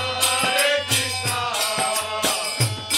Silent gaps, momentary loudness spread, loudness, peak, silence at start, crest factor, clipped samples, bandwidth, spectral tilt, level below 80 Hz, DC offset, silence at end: none; 4 LU; -20 LUFS; -6 dBFS; 0 s; 16 dB; under 0.1%; 16.5 kHz; -1.5 dB/octave; -56 dBFS; under 0.1%; 0 s